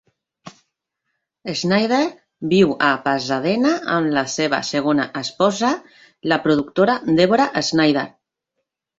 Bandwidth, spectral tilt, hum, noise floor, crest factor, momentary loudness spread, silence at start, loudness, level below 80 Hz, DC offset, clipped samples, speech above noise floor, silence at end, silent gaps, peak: 8 kHz; -5 dB/octave; none; -77 dBFS; 20 dB; 9 LU; 0.45 s; -19 LUFS; -60 dBFS; under 0.1%; under 0.1%; 59 dB; 0.9 s; none; 0 dBFS